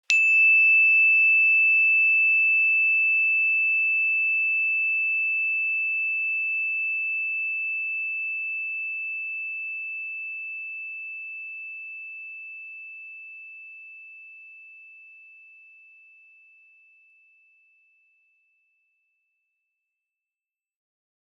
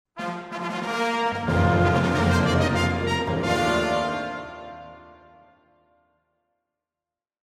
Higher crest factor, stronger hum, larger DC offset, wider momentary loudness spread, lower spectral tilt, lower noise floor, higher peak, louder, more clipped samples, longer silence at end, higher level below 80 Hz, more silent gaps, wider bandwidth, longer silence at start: first, 24 dB vs 16 dB; neither; neither; first, 22 LU vs 16 LU; second, 7.5 dB/octave vs -6 dB/octave; about the same, under -90 dBFS vs under -90 dBFS; first, -2 dBFS vs -8 dBFS; first, -20 LUFS vs -23 LUFS; neither; first, 6.3 s vs 2.45 s; second, under -90 dBFS vs -44 dBFS; neither; second, 8.2 kHz vs 14.5 kHz; about the same, 0.1 s vs 0.15 s